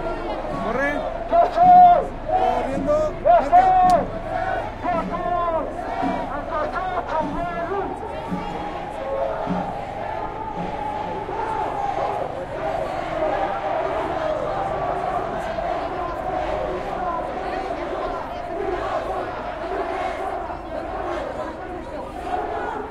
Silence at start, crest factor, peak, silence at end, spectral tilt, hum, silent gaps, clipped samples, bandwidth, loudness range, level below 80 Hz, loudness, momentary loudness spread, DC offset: 0 s; 18 dB; -4 dBFS; 0 s; -6.5 dB/octave; none; none; under 0.1%; 10.5 kHz; 10 LU; -38 dBFS; -23 LUFS; 12 LU; under 0.1%